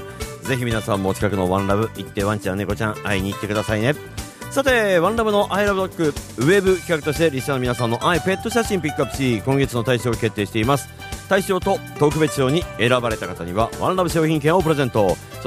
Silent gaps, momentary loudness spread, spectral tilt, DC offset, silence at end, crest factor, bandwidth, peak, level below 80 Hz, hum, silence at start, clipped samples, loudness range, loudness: none; 6 LU; -5.5 dB/octave; under 0.1%; 0 s; 18 dB; 15.5 kHz; -2 dBFS; -40 dBFS; none; 0 s; under 0.1%; 3 LU; -20 LUFS